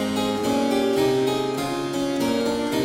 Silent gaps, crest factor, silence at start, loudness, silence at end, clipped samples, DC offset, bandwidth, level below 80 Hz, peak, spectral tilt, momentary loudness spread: none; 14 dB; 0 s; -23 LUFS; 0 s; under 0.1%; under 0.1%; 16.5 kHz; -52 dBFS; -10 dBFS; -5 dB/octave; 5 LU